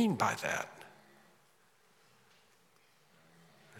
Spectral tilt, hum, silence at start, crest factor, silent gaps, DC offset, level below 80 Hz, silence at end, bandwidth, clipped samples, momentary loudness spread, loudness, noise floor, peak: -4.5 dB/octave; none; 0 s; 24 dB; none; under 0.1%; -84 dBFS; 0 s; 17 kHz; under 0.1%; 25 LU; -34 LUFS; -69 dBFS; -16 dBFS